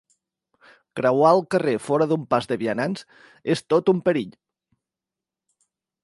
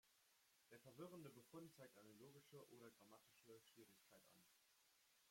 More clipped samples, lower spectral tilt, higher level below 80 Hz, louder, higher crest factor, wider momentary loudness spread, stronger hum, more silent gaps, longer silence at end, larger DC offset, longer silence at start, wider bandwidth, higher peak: neither; first, -6.5 dB/octave vs -5 dB/octave; first, -68 dBFS vs under -90 dBFS; first, -22 LUFS vs -65 LUFS; about the same, 20 dB vs 20 dB; first, 13 LU vs 8 LU; neither; neither; first, 1.75 s vs 0 s; neither; first, 0.95 s vs 0.05 s; second, 11.5 kHz vs 16.5 kHz; first, -4 dBFS vs -46 dBFS